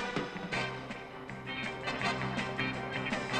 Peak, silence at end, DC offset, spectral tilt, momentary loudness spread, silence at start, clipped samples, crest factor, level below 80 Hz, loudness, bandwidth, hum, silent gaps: -18 dBFS; 0 s; under 0.1%; -4.5 dB/octave; 10 LU; 0 s; under 0.1%; 18 dB; -58 dBFS; -36 LUFS; 12.5 kHz; none; none